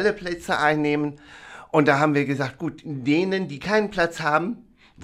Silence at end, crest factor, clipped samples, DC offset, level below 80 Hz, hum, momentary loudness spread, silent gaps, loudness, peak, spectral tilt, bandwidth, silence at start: 0 s; 20 dB; under 0.1%; under 0.1%; -54 dBFS; none; 13 LU; none; -23 LUFS; -2 dBFS; -6 dB/octave; 14 kHz; 0 s